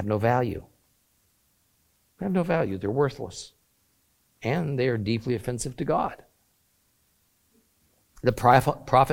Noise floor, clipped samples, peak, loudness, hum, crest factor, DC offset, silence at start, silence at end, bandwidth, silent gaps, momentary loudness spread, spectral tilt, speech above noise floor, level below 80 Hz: -68 dBFS; under 0.1%; -4 dBFS; -26 LUFS; none; 24 dB; under 0.1%; 0 s; 0 s; 16.5 kHz; none; 16 LU; -6.5 dB/octave; 44 dB; -52 dBFS